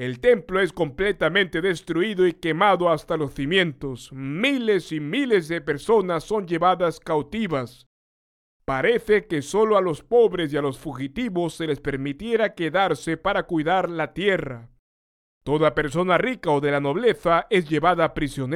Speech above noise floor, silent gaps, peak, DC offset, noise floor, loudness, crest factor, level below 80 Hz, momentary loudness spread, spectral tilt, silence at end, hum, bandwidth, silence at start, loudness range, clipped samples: over 68 dB; 7.86-8.60 s, 14.79-15.41 s; -6 dBFS; under 0.1%; under -90 dBFS; -22 LUFS; 18 dB; -48 dBFS; 8 LU; -6 dB/octave; 0 s; none; 14.5 kHz; 0 s; 3 LU; under 0.1%